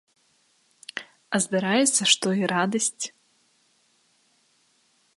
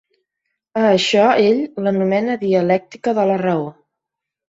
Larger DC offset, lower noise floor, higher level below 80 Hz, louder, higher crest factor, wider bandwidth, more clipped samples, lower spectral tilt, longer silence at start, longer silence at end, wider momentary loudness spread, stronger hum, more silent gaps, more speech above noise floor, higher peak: neither; second, -66 dBFS vs -83 dBFS; second, -74 dBFS vs -62 dBFS; second, -23 LUFS vs -17 LUFS; first, 24 dB vs 16 dB; first, 12 kHz vs 7.8 kHz; neither; second, -2.5 dB/octave vs -5.5 dB/octave; first, 0.95 s vs 0.75 s; first, 2.1 s vs 0.75 s; first, 18 LU vs 8 LU; neither; neither; second, 42 dB vs 67 dB; about the same, -4 dBFS vs -2 dBFS